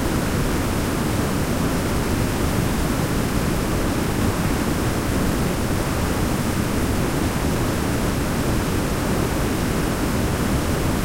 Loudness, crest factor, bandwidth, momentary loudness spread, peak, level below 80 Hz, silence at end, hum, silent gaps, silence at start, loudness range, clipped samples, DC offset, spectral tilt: -22 LUFS; 14 dB; 16 kHz; 1 LU; -8 dBFS; -28 dBFS; 0 s; none; none; 0 s; 0 LU; under 0.1%; under 0.1%; -5.5 dB/octave